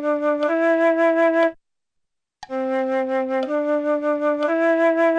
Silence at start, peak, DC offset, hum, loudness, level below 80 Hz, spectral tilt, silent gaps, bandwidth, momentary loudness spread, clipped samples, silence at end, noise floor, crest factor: 0 s; -10 dBFS; under 0.1%; none; -20 LUFS; -70 dBFS; -4.5 dB/octave; none; 8.4 kHz; 6 LU; under 0.1%; 0 s; -79 dBFS; 12 dB